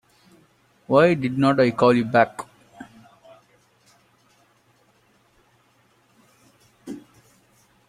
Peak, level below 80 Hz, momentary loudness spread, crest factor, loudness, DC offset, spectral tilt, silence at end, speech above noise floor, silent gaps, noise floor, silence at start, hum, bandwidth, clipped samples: -4 dBFS; -64 dBFS; 27 LU; 22 dB; -19 LUFS; under 0.1%; -7 dB/octave; 0.9 s; 43 dB; none; -61 dBFS; 0.9 s; none; 13 kHz; under 0.1%